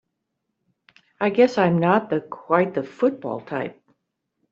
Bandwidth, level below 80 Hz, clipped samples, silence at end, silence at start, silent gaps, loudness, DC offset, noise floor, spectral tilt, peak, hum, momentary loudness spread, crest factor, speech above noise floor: 7.4 kHz; -66 dBFS; under 0.1%; 0.8 s; 1.2 s; none; -22 LUFS; under 0.1%; -78 dBFS; -7.5 dB/octave; -4 dBFS; none; 12 LU; 20 dB; 57 dB